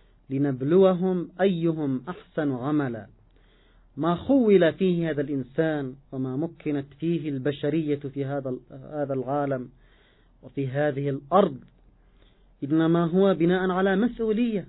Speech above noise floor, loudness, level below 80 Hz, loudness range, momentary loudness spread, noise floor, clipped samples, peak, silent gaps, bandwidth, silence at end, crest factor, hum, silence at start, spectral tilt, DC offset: 34 dB; -25 LUFS; -58 dBFS; 5 LU; 13 LU; -58 dBFS; under 0.1%; -6 dBFS; none; 4.1 kHz; 0.05 s; 18 dB; none; 0.3 s; -12 dB/octave; under 0.1%